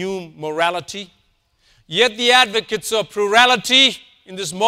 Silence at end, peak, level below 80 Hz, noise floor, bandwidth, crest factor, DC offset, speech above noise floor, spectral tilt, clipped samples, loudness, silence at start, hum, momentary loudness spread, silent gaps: 0 s; 0 dBFS; -60 dBFS; -62 dBFS; 16 kHz; 18 dB; under 0.1%; 44 dB; -1.5 dB/octave; under 0.1%; -15 LUFS; 0 s; none; 17 LU; none